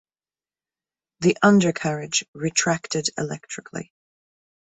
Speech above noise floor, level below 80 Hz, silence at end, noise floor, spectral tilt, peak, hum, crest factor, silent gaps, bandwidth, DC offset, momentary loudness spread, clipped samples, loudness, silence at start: over 68 dB; -62 dBFS; 0.95 s; under -90 dBFS; -4 dB/octave; -4 dBFS; none; 22 dB; 2.28-2.33 s; 8.4 kHz; under 0.1%; 17 LU; under 0.1%; -22 LUFS; 1.2 s